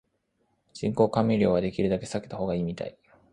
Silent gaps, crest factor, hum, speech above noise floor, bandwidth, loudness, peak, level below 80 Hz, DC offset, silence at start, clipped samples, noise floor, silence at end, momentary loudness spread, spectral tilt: none; 20 dB; none; 47 dB; 11 kHz; -27 LUFS; -8 dBFS; -54 dBFS; under 0.1%; 0.75 s; under 0.1%; -73 dBFS; 0.4 s; 11 LU; -7.5 dB/octave